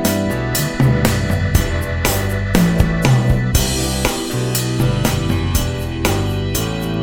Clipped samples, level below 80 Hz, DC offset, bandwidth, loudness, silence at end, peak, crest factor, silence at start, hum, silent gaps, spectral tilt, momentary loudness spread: under 0.1%; -26 dBFS; under 0.1%; over 20 kHz; -17 LUFS; 0 s; 0 dBFS; 16 dB; 0 s; none; none; -5 dB/octave; 5 LU